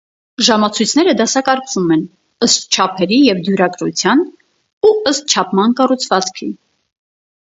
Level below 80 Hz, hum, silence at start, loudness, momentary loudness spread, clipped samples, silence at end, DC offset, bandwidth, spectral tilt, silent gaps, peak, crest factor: -60 dBFS; none; 0.4 s; -13 LUFS; 9 LU; under 0.1%; 0.95 s; under 0.1%; 8 kHz; -3.5 dB/octave; 4.73-4.81 s; 0 dBFS; 14 dB